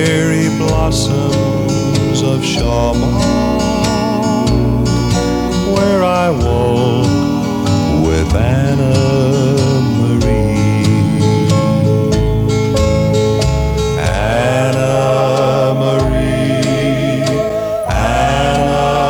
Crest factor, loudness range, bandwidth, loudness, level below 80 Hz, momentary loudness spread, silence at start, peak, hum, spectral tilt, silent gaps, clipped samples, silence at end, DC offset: 12 dB; 1 LU; 18.5 kHz; -13 LUFS; -24 dBFS; 2 LU; 0 s; 0 dBFS; none; -6 dB/octave; none; under 0.1%; 0 s; under 0.1%